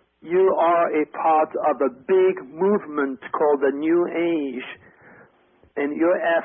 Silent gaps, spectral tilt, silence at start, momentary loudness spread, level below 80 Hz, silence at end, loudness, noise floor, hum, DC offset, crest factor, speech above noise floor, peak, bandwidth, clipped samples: none; -10.5 dB/octave; 0.25 s; 8 LU; -68 dBFS; 0 s; -21 LUFS; -58 dBFS; none; under 0.1%; 12 dB; 37 dB; -10 dBFS; 3.7 kHz; under 0.1%